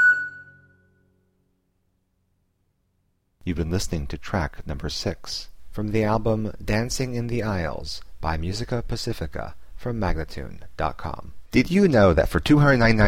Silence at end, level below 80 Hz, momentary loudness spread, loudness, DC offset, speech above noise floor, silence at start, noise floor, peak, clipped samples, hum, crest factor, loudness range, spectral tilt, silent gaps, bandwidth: 0 s; -36 dBFS; 18 LU; -24 LUFS; 0.9%; 47 dB; 0 s; -70 dBFS; -6 dBFS; under 0.1%; none; 18 dB; 10 LU; -6 dB/octave; none; 16.5 kHz